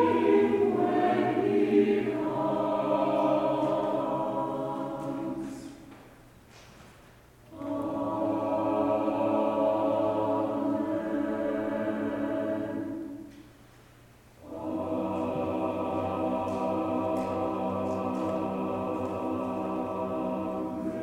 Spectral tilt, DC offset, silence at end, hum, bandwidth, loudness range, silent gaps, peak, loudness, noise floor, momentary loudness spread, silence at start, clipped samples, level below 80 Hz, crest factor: -7.5 dB/octave; under 0.1%; 0 s; none; 15 kHz; 9 LU; none; -12 dBFS; -29 LUFS; -55 dBFS; 9 LU; 0 s; under 0.1%; -62 dBFS; 16 dB